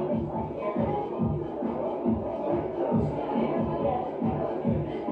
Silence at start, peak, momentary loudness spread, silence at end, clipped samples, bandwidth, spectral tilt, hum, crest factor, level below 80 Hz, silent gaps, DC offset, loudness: 0 s; -14 dBFS; 3 LU; 0 s; under 0.1%; 5 kHz; -10.5 dB/octave; none; 14 dB; -48 dBFS; none; under 0.1%; -29 LUFS